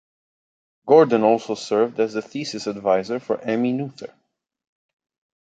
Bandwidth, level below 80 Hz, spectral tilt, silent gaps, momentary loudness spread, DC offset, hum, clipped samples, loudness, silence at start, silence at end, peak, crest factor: 8.8 kHz; -70 dBFS; -6 dB/octave; none; 16 LU; under 0.1%; none; under 0.1%; -21 LUFS; 0.85 s; 1.5 s; -2 dBFS; 20 dB